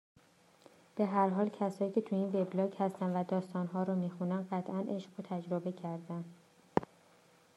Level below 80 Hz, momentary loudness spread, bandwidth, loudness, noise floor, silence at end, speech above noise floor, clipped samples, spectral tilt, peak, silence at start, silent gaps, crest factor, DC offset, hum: -76 dBFS; 10 LU; 11 kHz; -36 LUFS; -65 dBFS; 0.7 s; 30 dB; under 0.1%; -8.5 dB/octave; -12 dBFS; 0.95 s; none; 26 dB; under 0.1%; none